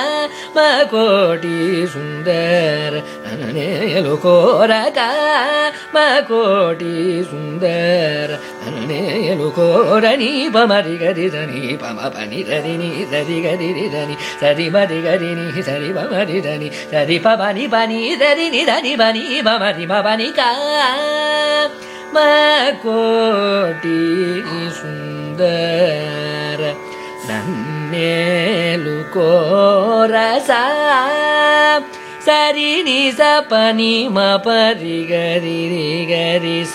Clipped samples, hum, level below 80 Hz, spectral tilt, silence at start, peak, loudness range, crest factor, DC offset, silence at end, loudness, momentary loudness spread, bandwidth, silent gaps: under 0.1%; none; -64 dBFS; -5 dB/octave; 0 s; 0 dBFS; 5 LU; 16 dB; under 0.1%; 0 s; -15 LUFS; 10 LU; 15 kHz; none